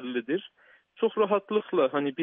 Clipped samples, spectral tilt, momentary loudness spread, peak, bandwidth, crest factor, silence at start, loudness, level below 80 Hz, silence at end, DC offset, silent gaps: under 0.1%; -4 dB/octave; 6 LU; -12 dBFS; 3.8 kHz; 16 dB; 0 s; -28 LUFS; -86 dBFS; 0 s; under 0.1%; none